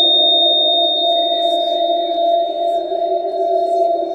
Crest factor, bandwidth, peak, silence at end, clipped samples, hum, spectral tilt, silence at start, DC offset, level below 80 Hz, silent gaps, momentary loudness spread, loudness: 12 dB; 8.6 kHz; -4 dBFS; 0 s; under 0.1%; none; -3 dB/octave; 0 s; under 0.1%; -62 dBFS; none; 9 LU; -14 LUFS